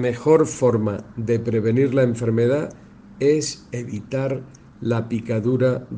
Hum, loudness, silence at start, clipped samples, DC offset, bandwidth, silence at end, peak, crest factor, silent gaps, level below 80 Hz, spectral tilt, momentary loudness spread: none; -21 LUFS; 0 s; under 0.1%; under 0.1%; 9.8 kHz; 0 s; -4 dBFS; 16 dB; none; -54 dBFS; -7 dB/octave; 12 LU